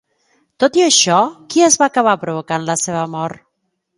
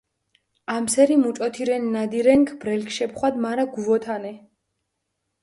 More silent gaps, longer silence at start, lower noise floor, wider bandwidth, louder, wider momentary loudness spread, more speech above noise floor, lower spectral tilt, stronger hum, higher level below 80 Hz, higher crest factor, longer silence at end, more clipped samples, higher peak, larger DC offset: neither; about the same, 0.6 s vs 0.7 s; second, -71 dBFS vs -78 dBFS; about the same, 11.5 kHz vs 11.5 kHz; first, -14 LUFS vs -22 LUFS; about the same, 10 LU vs 12 LU; about the same, 56 dB vs 56 dB; second, -2.5 dB/octave vs -4.5 dB/octave; neither; about the same, -62 dBFS vs -62 dBFS; about the same, 16 dB vs 18 dB; second, 0.65 s vs 1.05 s; neither; first, 0 dBFS vs -4 dBFS; neither